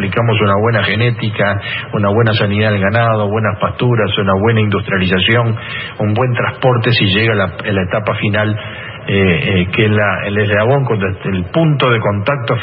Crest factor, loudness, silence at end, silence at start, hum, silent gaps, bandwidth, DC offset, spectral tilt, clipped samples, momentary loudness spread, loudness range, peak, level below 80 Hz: 12 dB; -14 LUFS; 0 s; 0 s; none; none; 5.4 kHz; under 0.1%; -10 dB/octave; under 0.1%; 6 LU; 1 LU; 0 dBFS; -46 dBFS